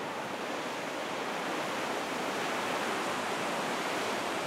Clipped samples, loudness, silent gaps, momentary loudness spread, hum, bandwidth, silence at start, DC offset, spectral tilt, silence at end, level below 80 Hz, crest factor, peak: under 0.1%; -33 LUFS; none; 4 LU; none; 16 kHz; 0 s; under 0.1%; -3 dB/octave; 0 s; -76 dBFS; 14 dB; -20 dBFS